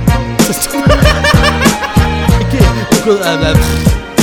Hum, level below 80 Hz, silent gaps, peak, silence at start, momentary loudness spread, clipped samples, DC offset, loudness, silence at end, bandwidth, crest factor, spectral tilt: none; -16 dBFS; none; 0 dBFS; 0 s; 4 LU; 0.5%; under 0.1%; -10 LUFS; 0 s; 19.5 kHz; 10 dB; -5 dB/octave